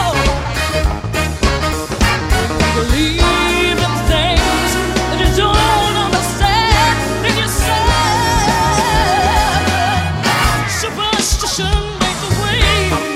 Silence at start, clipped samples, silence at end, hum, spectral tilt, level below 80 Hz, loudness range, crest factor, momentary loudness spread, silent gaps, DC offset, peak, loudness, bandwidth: 0 s; under 0.1%; 0 s; none; -4 dB/octave; -20 dBFS; 2 LU; 14 dB; 5 LU; none; under 0.1%; 0 dBFS; -14 LUFS; 16 kHz